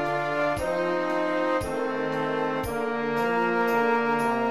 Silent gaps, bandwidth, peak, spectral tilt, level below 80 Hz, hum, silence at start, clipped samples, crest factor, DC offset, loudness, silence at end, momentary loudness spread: none; 15 kHz; -12 dBFS; -5.5 dB/octave; -52 dBFS; none; 0 s; under 0.1%; 14 dB; 0.4%; -26 LUFS; 0 s; 5 LU